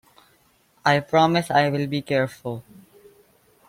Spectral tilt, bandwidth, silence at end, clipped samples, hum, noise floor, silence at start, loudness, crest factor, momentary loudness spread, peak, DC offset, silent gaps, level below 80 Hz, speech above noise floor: -6 dB/octave; 16 kHz; 1.05 s; under 0.1%; none; -61 dBFS; 0.85 s; -22 LUFS; 20 dB; 15 LU; -4 dBFS; under 0.1%; none; -62 dBFS; 40 dB